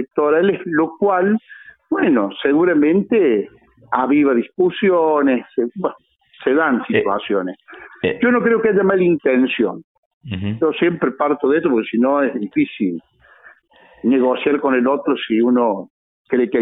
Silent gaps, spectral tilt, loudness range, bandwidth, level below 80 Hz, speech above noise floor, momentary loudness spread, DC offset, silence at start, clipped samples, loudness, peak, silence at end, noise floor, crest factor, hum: 9.84-10.21 s, 15.90-16.25 s; -10.5 dB/octave; 3 LU; 4 kHz; -60 dBFS; 33 dB; 8 LU; under 0.1%; 0 s; under 0.1%; -17 LUFS; -2 dBFS; 0 s; -50 dBFS; 16 dB; none